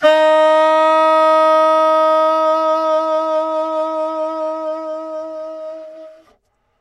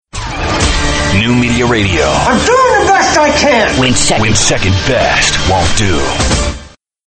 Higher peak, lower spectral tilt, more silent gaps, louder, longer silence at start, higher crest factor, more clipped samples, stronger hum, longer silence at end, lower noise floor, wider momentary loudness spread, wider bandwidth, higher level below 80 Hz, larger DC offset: about the same, 0 dBFS vs 0 dBFS; about the same, -2.5 dB/octave vs -3.5 dB/octave; neither; second, -14 LUFS vs -10 LUFS; second, 0 s vs 0.15 s; about the same, 14 dB vs 10 dB; neither; neither; first, 0.7 s vs 0.4 s; first, -60 dBFS vs -34 dBFS; first, 16 LU vs 5 LU; about the same, 9.6 kHz vs 9.2 kHz; second, -70 dBFS vs -22 dBFS; neither